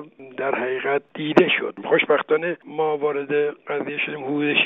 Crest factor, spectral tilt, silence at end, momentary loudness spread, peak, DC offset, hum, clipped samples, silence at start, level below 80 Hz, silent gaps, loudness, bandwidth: 22 dB; -2.5 dB/octave; 0 s; 8 LU; 0 dBFS; under 0.1%; none; under 0.1%; 0 s; -68 dBFS; none; -22 LUFS; 6.4 kHz